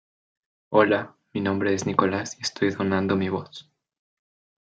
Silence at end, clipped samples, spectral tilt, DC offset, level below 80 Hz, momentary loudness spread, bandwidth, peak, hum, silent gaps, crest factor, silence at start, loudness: 1.05 s; under 0.1%; -5.5 dB/octave; under 0.1%; -70 dBFS; 11 LU; 9.2 kHz; -4 dBFS; none; none; 22 dB; 0.7 s; -24 LUFS